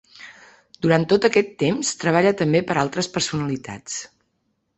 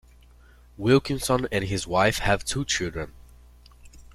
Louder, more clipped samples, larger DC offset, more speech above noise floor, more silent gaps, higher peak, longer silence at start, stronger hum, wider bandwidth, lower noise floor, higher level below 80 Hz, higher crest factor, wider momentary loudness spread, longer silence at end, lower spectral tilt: first, -21 LUFS vs -24 LUFS; neither; neither; first, 51 dB vs 28 dB; neither; first, -2 dBFS vs -6 dBFS; second, 0.2 s vs 0.8 s; second, none vs 60 Hz at -45 dBFS; second, 8.4 kHz vs 15.5 kHz; first, -71 dBFS vs -52 dBFS; second, -58 dBFS vs -44 dBFS; about the same, 20 dB vs 20 dB; first, 13 LU vs 9 LU; first, 0.7 s vs 0.15 s; about the same, -4.5 dB/octave vs -4.5 dB/octave